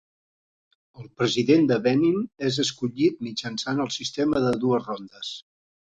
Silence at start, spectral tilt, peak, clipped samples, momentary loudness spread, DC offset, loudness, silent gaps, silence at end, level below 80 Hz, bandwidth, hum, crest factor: 1 s; -5 dB/octave; -6 dBFS; under 0.1%; 14 LU; under 0.1%; -24 LUFS; none; 0.55 s; -60 dBFS; 9.2 kHz; none; 18 dB